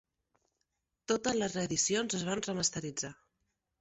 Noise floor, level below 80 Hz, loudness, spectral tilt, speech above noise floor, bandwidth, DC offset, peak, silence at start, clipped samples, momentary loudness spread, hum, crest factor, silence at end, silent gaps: -84 dBFS; -68 dBFS; -33 LUFS; -3 dB/octave; 51 dB; 8.2 kHz; under 0.1%; -16 dBFS; 1.1 s; under 0.1%; 10 LU; none; 20 dB; 0.7 s; none